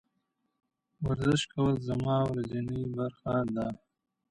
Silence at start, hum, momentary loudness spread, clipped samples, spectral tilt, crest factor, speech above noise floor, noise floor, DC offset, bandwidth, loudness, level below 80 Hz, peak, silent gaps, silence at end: 1 s; none; 7 LU; under 0.1%; -6.5 dB/octave; 16 dB; 49 dB; -79 dBFS; under 0.1%; 11 kHz; -31 LUFS; -54 dBFS; -16 dBFS; none; 0.55 s